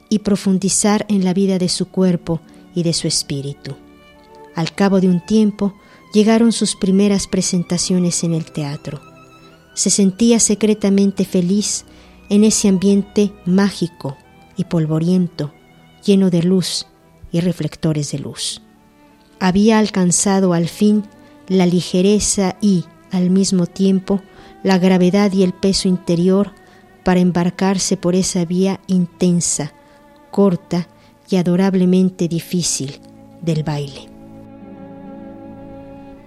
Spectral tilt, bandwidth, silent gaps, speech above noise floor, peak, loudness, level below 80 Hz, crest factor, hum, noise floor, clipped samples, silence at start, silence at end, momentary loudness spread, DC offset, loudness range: -5 dB/octave; 13.5 kHz; none; 33 dB; 0 dBFS; -16 LUFS; -48 dBFS; 16 dB; none; -49 dBFS; under 0.1%; 0.1 s; 0.1 s; 15 LU; under 0.1%; 4 LU